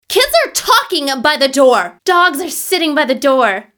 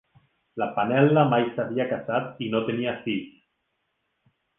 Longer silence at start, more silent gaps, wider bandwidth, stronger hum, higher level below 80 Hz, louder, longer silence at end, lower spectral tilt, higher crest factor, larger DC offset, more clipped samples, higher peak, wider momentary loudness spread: second, 0.1 s vs 0.55 s; neither; first, over 20 kHz vs 3.8 kHz; neither; first, -50 dBFS vs -68 dBFS; first, -12 LUFS vs -25 LUFS; second, 0.15 s vs 1.3 s; second, -1 dB/octave vs -10 dB/octave; second, 12 dB vs 20 dB; neither; neither; first, 0 dBFS vs -6 dBFS; second, 4 LU vs 12 LU